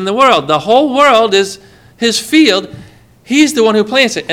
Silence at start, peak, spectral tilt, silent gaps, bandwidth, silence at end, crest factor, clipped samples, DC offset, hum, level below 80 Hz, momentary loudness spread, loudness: 0 s; 0 dBFS; -3 dB/octave; none; 16.5 kHz; 0 s; 12 dB; 0.3%; under 0.1%; none; -52 dBFS; 8 LU; -10 LUFS